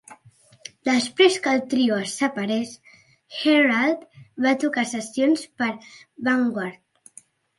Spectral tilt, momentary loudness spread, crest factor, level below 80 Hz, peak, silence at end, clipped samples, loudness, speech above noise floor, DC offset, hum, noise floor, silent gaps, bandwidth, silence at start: -3.5 dB/octave; 16 LU; 18 dB; -72 dBFS; -4 dBFS; 0.85 s; under 0.1%; -22 LUFS; 33 dB; under 0.1%; none; -55 dBFS; none; 11.5 kHz; 0.1 s